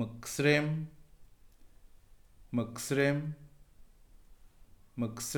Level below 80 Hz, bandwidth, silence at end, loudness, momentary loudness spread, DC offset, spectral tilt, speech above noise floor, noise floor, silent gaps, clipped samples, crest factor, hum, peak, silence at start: -60 dBFS; over 20 kHz; 0 s; -32 LUFS; 18 LU; under 0.1%; -5 dB/octave; 26 dB; -58 dBFS; none; under 0.1%; 22 dB; none; -12 dBFS; 0 s